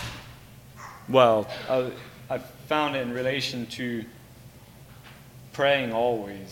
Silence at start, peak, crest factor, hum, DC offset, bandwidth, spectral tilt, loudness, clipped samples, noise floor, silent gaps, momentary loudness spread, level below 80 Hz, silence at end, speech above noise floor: 0 s; -4 dBFS; 24 dB; none; under 0.1%; 17 kHz; -5 dB/octave; -26 LUFS; under 0.1%; -48 dBFS; none; 24 LU; -58 dBFS; 0 s; 23 dB